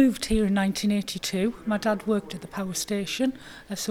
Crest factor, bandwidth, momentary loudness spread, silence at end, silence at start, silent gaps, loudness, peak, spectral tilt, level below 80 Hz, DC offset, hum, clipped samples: 16 dB; 16.5 kHz; 9 LU; 0 s; 0 s; none; -27 LUFS; -10 dBFS; -4.5 dB/octave; -44 dBFS; 0.1%; none; under 0.1%